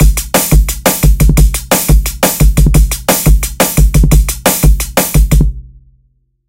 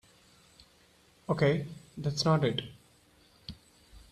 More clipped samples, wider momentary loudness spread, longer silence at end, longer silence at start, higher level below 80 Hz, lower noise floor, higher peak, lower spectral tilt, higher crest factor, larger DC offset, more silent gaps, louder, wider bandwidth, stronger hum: first, 0.2% vs under 0.1%; second, 3 LU vs 21 LU; first, 0.85 s vs 0.1 s; second, 0 s vs 1.3 s; first, -10 dBFS vs -60 dBFS; second, -55 dBFS vs -63 dBFS; first, 0 dBFS vs -14 dBFS; second, -4.5 dB/octave vs -6 dB/octave; second, 8 dB vs 20 dB; first, 0.5% vs under 0.1%; neither; first, -10 LUFS vs -30 LUFS; first, 17 kHz vs 12.5 kHz; neither